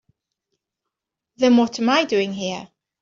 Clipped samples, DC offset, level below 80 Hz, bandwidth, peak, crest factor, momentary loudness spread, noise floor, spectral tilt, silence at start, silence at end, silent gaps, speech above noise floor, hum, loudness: under 0.1%; under 0.1%; -68 dBFS; 7.4 kHz; -6 dBFS; 16 dB; 12 LU; -83 dBFS; -4.5 dB/octave; 1.4 s; 0.35 s; none; 65 dB; none; -19 LUFS